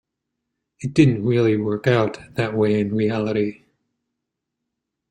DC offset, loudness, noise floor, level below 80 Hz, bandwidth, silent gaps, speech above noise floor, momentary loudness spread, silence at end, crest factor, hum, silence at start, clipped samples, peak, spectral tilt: under 0.1%; -20 LUFS; -81 dBFS; -56 dBFS; 10 kHz; none; 62 dB; 8 LU; 1.6 s; 20 dB; none; 0.8 s; under 0.1%; -2 dBFS; -7.5 dB/octave